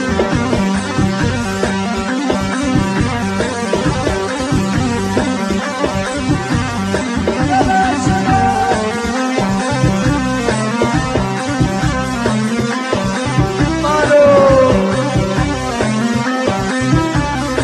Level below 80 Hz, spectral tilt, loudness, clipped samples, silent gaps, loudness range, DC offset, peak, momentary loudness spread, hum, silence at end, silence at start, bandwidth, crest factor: -30 dBFS; -5.5 dB/octave; -15 LUFS; under 0.1%; none; 4 LU; under 0.1%; 0 dBFS; 5 LU; none; 0 s; 0 s; 13 kHz; 14 dB